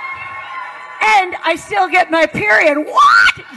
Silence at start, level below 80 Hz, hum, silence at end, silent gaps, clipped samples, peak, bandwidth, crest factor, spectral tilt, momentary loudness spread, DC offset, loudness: 0 s; -52 dBFS; none; 0 s; none; under 0.1%; -2 dBFS; 12.5 kHz; 12 dB; -3 dB/octave; 18 LU; under 0.1%; -12 LUFS